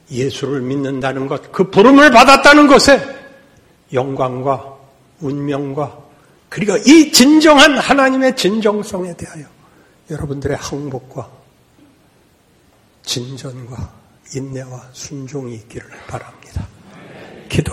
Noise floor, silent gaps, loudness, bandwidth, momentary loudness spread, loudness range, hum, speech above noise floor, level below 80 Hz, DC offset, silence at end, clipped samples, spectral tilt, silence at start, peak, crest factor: -53 dBFS; none; -12 LUFS; 16.5 kHz; 24 LU; 20 LU; none; 39 dB; -42 dBFS; under 0.1%; 0 s; 0.2%; -4 dB/octave; 0.1 s; 0 dBFS; 14 dB